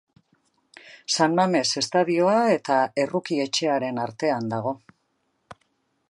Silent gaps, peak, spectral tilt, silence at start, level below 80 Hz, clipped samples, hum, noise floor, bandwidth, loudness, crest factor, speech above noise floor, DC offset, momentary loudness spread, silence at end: none; -6 dBFS; -4 dB/octave; 0.85 s; -72 dBFS; under 0.1%; none; -72 dBFS; 11.5 kHz; -23 LUFS; 20 dB; 49 dB; under 0.1%; 9 LU; 0.55 s